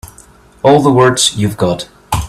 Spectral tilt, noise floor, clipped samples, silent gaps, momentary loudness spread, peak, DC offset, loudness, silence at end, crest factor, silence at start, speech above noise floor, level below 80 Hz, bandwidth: -4.5 dB/octave; -42 dBFS; under 0.1%; none; 10 LU; 0 dBFS; under 0.1%; -11 LUFS; 0 s; 12 dB; 0.05 s; 32 dB; -34 dBFS; 15 kHz